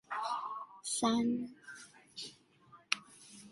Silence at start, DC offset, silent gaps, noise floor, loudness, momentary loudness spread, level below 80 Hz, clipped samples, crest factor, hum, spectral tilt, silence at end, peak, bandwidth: 0.1 s; under 0.1%; none; -63 dBFS; -37 LUFS; 20 LU; -78 dBFS; under 0.1%; 28 dB; none; -2.5 dB/octave; 0 s; -10 dBFS; 11.5 kHz